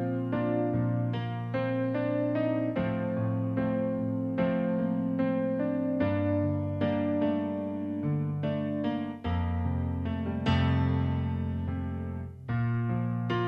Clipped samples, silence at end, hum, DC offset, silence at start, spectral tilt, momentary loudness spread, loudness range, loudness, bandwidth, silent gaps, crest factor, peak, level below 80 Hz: under 0.1%; 0 s; none; under 0.1%; 0 s; -9.5 dB/octave; 5 LU; 2 LU; -30 LUFS; 6 kHz; none; 16 dB; -12 dBFS; -48 dBFS